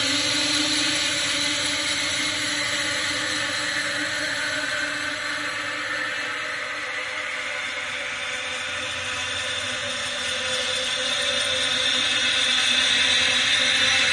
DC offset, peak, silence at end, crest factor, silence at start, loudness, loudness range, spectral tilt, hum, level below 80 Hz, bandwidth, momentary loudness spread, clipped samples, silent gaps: under 0.1%; -8 dBFS; 0 s; 16 dB; 0 s; -22 LUFS; 7 LU; -0.5 dB/octave; none; -60 dBFS; 11.5 kHz; 9 LU; under 0.1%; none